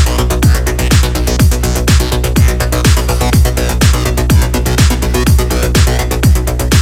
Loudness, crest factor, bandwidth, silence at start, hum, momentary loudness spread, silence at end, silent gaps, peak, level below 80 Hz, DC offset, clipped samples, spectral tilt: -11 LUFS; 10 dB; 16.5 kHz; 0 s; none; 2 LU; 0 s; none; 0 dBFS; -12 dBFS; under 0.1%; under 0.1%; -5 dB/octave